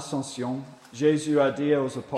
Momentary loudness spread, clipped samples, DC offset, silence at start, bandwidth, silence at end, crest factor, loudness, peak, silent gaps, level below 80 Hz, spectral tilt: 11 LU; under 0.1%; under 0.1%; 0 s; 12 kHz; 0 s; 18 dB; -25 LUFS; -8 dBFS; none; -70 dBFS; -6 dB/octave